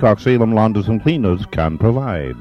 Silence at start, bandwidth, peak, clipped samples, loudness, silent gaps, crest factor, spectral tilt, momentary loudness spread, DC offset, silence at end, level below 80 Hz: 0 s; 6.6 kHz; 0 dBFS; under 0.1%; -16 LUFS; none; 14 dB; -9 dB/octave; 6 LU; under 0.1%; 0 s; -34 dBFS